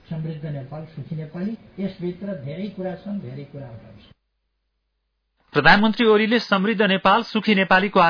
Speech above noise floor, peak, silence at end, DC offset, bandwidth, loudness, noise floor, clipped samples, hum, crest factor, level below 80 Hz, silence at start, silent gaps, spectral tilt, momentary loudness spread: 53 dB; -4 dBFS; 0 s; under 0.1%; 5.4 kHz; -20 LUFS; -74 dBFS; under 0.1%; none; 18 dB; -50 dBFS; 0.1 s; none; -7 dB/octave; 19 LU